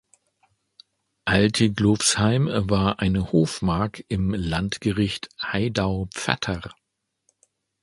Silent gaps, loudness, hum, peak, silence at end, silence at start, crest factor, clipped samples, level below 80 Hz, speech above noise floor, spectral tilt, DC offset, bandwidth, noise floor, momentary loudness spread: none; -23 LUFS; none; 0 dBFS; 1.1 s; 1.25 s; 24 dB; under 0.1%; -42 dBFS; 48 dB; -5 dB/octave; under 0.1%; 11.5 kHz; -70 dBFS; 8 LU